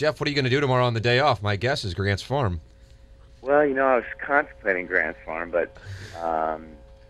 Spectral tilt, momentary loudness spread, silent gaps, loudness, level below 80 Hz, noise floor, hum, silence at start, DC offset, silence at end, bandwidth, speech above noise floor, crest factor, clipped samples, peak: -6 dB/octave; 12 LU; none; -24 LUFS; -48 dBFS; -49 dBFS; none; 0 s; under 0.1%; 0.15 s; 12 kHz; 25 dB; 20 dB; under 0.1%; -4 dBFS